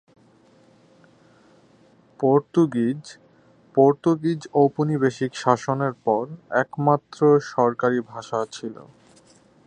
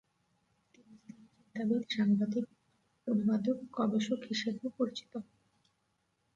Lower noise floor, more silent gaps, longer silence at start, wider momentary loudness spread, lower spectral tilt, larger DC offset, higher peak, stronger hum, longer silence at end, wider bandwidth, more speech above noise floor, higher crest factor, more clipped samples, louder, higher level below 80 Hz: second, -56 dBFS vs -79 dBFS; neither; first, 2.2 s vs 0.9 s; second, 9 LU vs 15 LU; about the same, -7 dB/octave vs -6 dB/octave; neither; first, -2 dBFS vs -20 dBFS; neither; second, 0.85 s vs 1.15 s; first, 9.6 kHz vs 7.8 kHz; second, 34 dB vs 46 dB; first, 22 dB vs 16 dB; neither; first, -22 LUFS vs -34 LUFS; first, -68 dBFS vs -78 dBFS